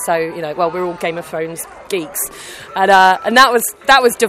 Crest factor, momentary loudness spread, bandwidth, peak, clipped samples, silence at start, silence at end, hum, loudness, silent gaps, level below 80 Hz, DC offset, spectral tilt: 14 dB; 14 LU; 16.5 kHz; 0 dBFS; 0.2%; 0 s; 0 s; none; -14 LUFS; none; -52 dBFS; under 0.1%; -2.5 dB/octave